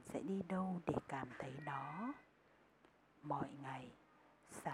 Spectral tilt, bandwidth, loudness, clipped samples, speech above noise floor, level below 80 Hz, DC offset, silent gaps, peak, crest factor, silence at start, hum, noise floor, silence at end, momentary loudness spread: -7 dB/octave; 14 kHz; -46 LUFS; under 0.1%; 26 dB; -74 dBFS; under 0.1%; none; -24 dBFS; 22 dB; 0 s; none; -71 dBFS; 0 s; 14 LU